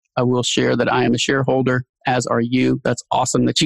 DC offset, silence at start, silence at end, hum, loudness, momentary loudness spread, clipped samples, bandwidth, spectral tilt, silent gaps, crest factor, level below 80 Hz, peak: under 0.1%; 0.15 s; 0 s; none; -18 LUFS; 4 LU; under 0.1%; 12 kHz; -4.5 dB/octave; 1.89-1.94 s; 14 dB; -50 dBFS; -4 dBFS